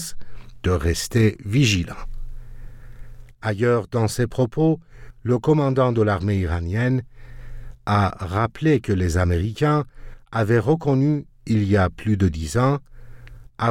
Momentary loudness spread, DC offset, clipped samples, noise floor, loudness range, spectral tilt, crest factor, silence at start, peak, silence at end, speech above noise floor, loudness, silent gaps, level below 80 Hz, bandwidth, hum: 10 LU; under 0.1%; under 0.1%; -40 dBFS; 3 LU; -6.5 dB/octave; 16 dB; 0 s; -6 dBFS; 0 s; 21 dB; -21 LUFS; none; -38 dBFS; 16.5 kHz; none